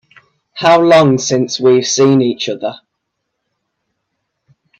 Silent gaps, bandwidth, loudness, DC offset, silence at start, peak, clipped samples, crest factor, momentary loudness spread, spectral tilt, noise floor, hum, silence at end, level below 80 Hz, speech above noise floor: none; 8.4 kHz; -11 LUFS; under 0.1%; 0.55 s; 0 dBFS; under 0.1%; 14 dB; 13 LU; -4.5 dB/octave; -73 dBFS; none; 2.05 s; -58 dBFS; 62 dB